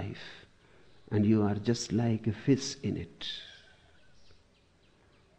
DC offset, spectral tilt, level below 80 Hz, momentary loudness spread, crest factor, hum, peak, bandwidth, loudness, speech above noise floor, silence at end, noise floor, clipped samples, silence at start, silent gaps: under 0.1%; -6 dB/octave; -62 dBFS; 18 LU; 20 dB; none; -14 dBFS; 9.4 kHz; -31 LUFS; 35 dB; 1.85 s; -65 dBFS; under 0.1%; 0 s; none